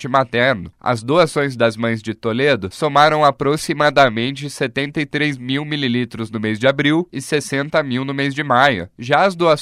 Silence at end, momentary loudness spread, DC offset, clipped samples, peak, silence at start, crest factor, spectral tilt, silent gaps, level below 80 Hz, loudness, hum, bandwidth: 0 s; 9 LU; under 0.1%; under 0.1%; 0 dBFS; 0 s; 18 dB; -5 dB/octave; none; -54 dBFS; -17 LUFS; none; 15 kHz